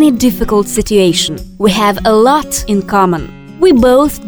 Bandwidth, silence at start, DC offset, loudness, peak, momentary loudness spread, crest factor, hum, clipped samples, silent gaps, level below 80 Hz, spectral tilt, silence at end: over 20 kHz; 0 s; under 0.1%; -11 LUFS; 0 dBFS; 6 LU; 10 dB; none; under 0.1%; none; -30 dBFS; -4.5 dB/octave; 0 s